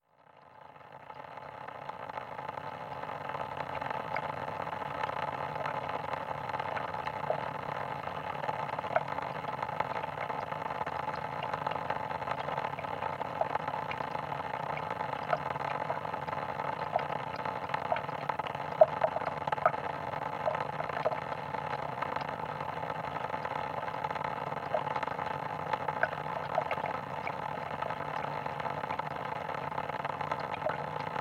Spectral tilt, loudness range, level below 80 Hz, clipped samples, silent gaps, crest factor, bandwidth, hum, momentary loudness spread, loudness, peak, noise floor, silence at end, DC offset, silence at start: -6 dB/octave; 5 LU; -66 dBFS; under 0.1%; none; 28 dB; 16 kHz; none; 5 LU; -35 LUFS; -8 dBFS; -60 dBFS; 0 s; under 0.1%; 0.35 s